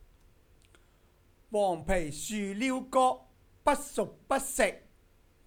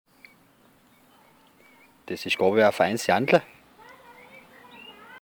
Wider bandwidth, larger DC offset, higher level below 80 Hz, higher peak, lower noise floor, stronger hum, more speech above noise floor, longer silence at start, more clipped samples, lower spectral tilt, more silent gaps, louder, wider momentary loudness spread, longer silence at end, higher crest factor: about the same, over 20 kHz vs over 20 kHz; neither; first, -48 dBFS vs -70 dBFS; second, -12 dBFS vs -6 dBFS; first, -64 dBFS vs -59 dBFS; neither; about the same, 34 dB vs 37 dB; second, 1.5 s vs 2.1 s; neither; about the same, -4 dB/octave vs -4.5 dB/octave; neither; second, -31 LUFS vs -23 LUFS; second, 8 LU vs 25 LU; first, 0.65 s vs 0.05 s; about the same, 20 dB vs 22 dB